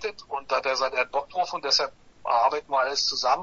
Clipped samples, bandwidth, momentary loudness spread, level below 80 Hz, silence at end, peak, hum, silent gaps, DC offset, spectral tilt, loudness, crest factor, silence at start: under 0.1%; 7.6 kHz; 9 LU; -62 dBFS; 0 s; -8 dBFS; none; none; under 0.1%; 0 dB/octave; -25 LUFS; 18 dB; 0 s